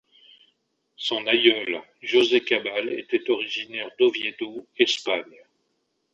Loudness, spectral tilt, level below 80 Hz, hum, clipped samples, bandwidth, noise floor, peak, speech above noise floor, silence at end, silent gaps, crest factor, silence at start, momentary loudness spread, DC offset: -23 LUFS; -2.5 dB/octave; -74 dBFS; none; under 0.1%; 8 kHz; -74 dBFS; -2 dBFS; 50 dB; 0.9 s; none; 22 dB; 1 s; 12 LU; under 0.1%